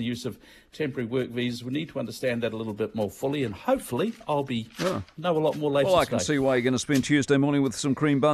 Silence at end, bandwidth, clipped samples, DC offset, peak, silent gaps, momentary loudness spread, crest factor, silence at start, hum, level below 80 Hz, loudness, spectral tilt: 0 s; 14.5 kHz; under 0.1%; under 0.1%; -8 dBFS; none; 9 LU; 18 dB; 0 s; none; -56 dBFS; -26 LUFS; -5.5 dB/octave